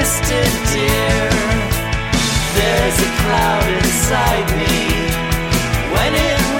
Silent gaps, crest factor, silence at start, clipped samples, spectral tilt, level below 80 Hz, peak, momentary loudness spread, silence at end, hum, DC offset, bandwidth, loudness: none; 14 dB; 0 s; under 0.1%; -4 dB/octave; -24 dBFS; -2 dBFS; 3 LU; 0 s; none; under 0.1%; 17 kHz; -15 LUFS